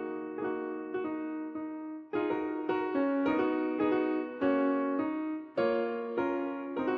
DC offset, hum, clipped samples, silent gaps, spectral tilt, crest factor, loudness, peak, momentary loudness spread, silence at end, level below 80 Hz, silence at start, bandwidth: under 0.1%; none; under 0.1%; none; -8 dB/octave; 16 dB; -32 LUFS; -16 dBFS; 8 LU; 0 s; -70 dBFS; 0 s; 5.2 kHz